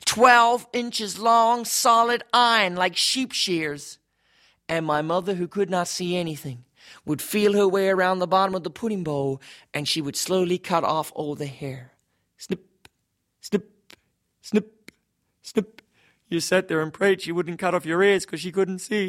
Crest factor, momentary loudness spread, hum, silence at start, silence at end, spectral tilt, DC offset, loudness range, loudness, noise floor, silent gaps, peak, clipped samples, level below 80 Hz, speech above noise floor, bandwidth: 22 dB; 15 LU; none; 0.05 s; 0 s; -3.5 dB/octave; under 0.1%; 12 LU; -23 LUFS; -75 dBFS; none; -2 dBFS; under 0.1%; -66 dBFS; 52 dB; 16 kHz